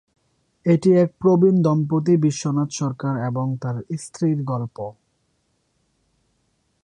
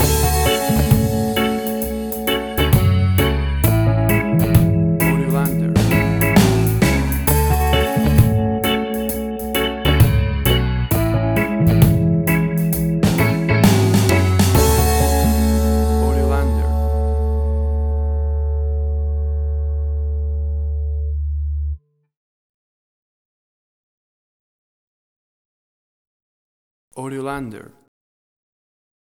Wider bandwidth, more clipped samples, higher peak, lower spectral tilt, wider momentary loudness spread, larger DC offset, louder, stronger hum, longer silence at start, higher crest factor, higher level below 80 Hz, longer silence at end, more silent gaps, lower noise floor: second, 10.5 kHz vs over 20 kHz; neither; second, -6 dBFS vs 0 dBFS; first, -7.5 dB/octave vs -6 dB/octave; first, 12 LU vs 9 LU; neither; second, -20 LUFS vs -17 LUFS; neither; first, 0.65 s vs 0 s; about the same, 16 dB vs 16 dB; second, -62 dBFS vs -24 dBFS; first, 1.95 s vs 1.5 s; second, none vs 22.17-26.91 s; second, -68 dBFS vs under -90 dBFS